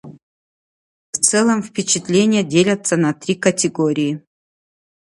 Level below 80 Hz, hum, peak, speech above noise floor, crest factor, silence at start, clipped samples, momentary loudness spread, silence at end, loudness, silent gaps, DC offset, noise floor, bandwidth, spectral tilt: -62 dBFS; none; 0 dBFS; over 73 dB; 18 dB; 0.05 s; under 0.1%; 6 LU; 0.95 s; -17 LUFS; 0.23-1.13 s; under 0.1%; under -90 dBFS; 11.5 kHz; -4 dB/octave